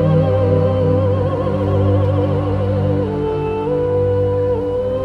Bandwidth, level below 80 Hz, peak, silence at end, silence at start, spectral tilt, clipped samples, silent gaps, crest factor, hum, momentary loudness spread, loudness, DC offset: 4.8 kHz; -36 dBFS; -2 dBFS; 0 s; 0 s; -10 dB/octave; under 0.1%; none; 12 dB; none; 4 LU; -17 LUFS; under 0.1%